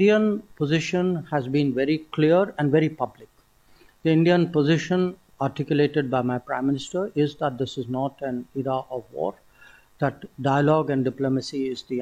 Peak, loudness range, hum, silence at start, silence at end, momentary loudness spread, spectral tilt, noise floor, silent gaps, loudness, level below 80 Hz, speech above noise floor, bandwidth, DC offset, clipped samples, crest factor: -8 dBFS; 6 LU; none; 0 s; 0 s; 10 LU; -7 dB/octave; -57 dBFS; none; -24 LUFS; -60 dBFS; 34 dB; 9.4 kHz; under 0.1%; under 0.1%; 16 dB